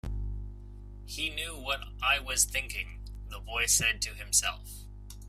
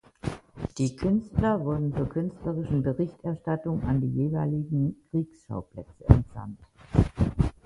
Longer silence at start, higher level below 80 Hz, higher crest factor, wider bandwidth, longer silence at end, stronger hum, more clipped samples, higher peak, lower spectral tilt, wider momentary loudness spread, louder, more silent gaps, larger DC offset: second, 0.05 s vs 0.25 s; second, -42 dBFS vs -36 dBFS; about the same, 22 dB vs 26 dB; first, 16 kHz vs 11 kHz; second, 0 s vs 0.15 s; first, 50 Hz at -45 dBFS vs none; neither; second, -10 dBFS vs 0 dBFS; second, -0.5 dB/octave vs -9 dB/octave; first, 21 LU vs 14 LU; about the same, -29 LUFS vs -28 LUFS; neither; neither